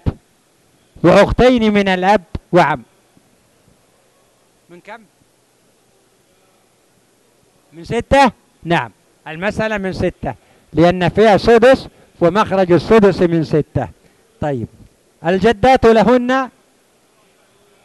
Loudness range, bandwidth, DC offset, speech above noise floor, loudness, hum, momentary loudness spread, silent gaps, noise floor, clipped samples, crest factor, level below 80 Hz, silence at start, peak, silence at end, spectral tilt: 8 LU; 12 kHz; under 0.1%; 43 dB; -14 LUFS; none; 15 LU; none; -56 dBFS; under 0.1%; 16 dB; -36 dBFS; 0.05 s; 0 dBFS; 1.35 s; -6.5 dB/octave